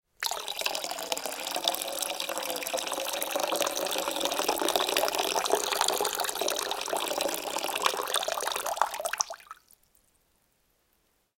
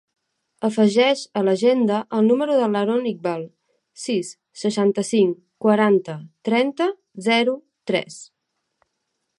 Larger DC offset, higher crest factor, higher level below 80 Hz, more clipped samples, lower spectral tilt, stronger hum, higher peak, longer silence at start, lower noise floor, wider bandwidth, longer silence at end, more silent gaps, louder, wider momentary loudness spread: neither; first, 26 dB vs 18 dB; first, -68 dBFS vs -74 dBFS; neither; second, 0.5 dB/octave vs -5 dB/octave; neither; about the same, -4 dBFS vs -4 dBFS; second, 0.2 s vs 0.6 s; second, -72 dBFS vs -76 dBFS; first, 17 kHz vs 11.5 kHz; first, 1.85 s vs 1.15 s; neither; second, -29 LUFS vs -21 LUFS; second, 6 LU vs 13 LU